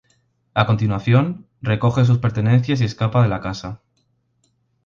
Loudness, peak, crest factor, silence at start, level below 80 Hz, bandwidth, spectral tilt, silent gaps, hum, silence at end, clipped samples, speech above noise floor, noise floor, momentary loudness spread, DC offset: -19 LUFS; 0 dBFS; 18 dB; 0.55 s; -46 dBFS; 7.2 kHz; -8 dB/octave; none; none; 1.1 s; under 0.1%; 49 dB; -66 dBFS; 12 LU; under 0.1%